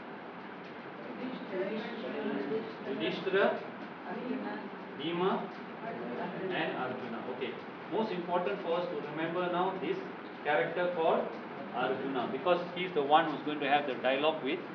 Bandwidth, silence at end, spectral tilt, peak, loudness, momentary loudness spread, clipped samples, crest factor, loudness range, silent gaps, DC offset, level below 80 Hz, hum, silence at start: 5.4 kHz; 0 s; -7.5 dB/octave; -12 dBFS; -34 LUFS; 12 LU; under 0.1%; 22 dB; 5 LU; none; under 0.1%; -90 dBFS; none; 0 s